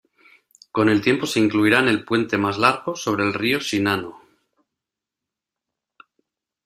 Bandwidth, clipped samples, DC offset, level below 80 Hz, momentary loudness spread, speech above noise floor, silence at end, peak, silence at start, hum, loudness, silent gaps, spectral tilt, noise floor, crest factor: 14.5 kHz; under 0.1%; under 0.1%; -60 dBFS; 8 LU; 66 dB; 2.5 s; -2 dBFS; 0.75 s; none; -20 LUFS; none; -5 dB/octave; -86 dBFS; 22 dB